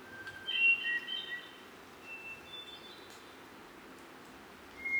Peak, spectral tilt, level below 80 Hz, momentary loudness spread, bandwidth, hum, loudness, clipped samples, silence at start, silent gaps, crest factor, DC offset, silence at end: -20 dBFS; -1.5 dB/octave; -74 dBFS; 25 LU; over 20 kHz; none; -33 LUFS; under 0.1%; 0 s; none; 20 dB; under 0.1%; 0 s